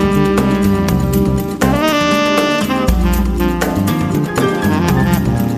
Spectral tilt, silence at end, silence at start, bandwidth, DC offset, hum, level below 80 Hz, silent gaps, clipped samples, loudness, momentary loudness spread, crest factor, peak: -6 dB/octave; 0 s; 0 s; 15.5 kHz; under 0.1%; none; -24 dBFS; none; under 0.1%; -14 LUFS; 3 LU; 14 dB; 0 dBFS